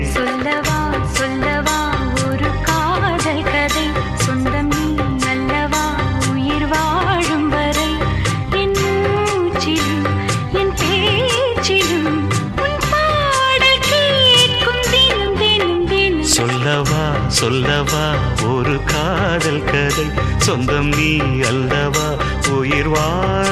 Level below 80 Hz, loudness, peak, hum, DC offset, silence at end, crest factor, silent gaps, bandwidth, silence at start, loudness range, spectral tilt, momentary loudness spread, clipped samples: -28 dBFS; -16 LUFS; 0 dBFS; none; under 0.1%; 0 s; 16 dB; none; 14 kHz; 0 s; 5 LU; -4 dB/octave; 6 LU; under 0.1%